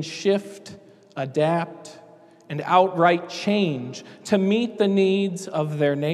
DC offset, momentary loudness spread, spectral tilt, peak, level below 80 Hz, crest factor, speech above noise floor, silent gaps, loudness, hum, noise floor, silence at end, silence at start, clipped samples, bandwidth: under 0.1%; 19 LU; -6 dB/octave; -4 dBFS; -76 dBFS; 20 dB; 28 dB; none; -22 LUFS; none; -50 dBFS; 0 s; 0 s; under 0.1%; 12.5 kHz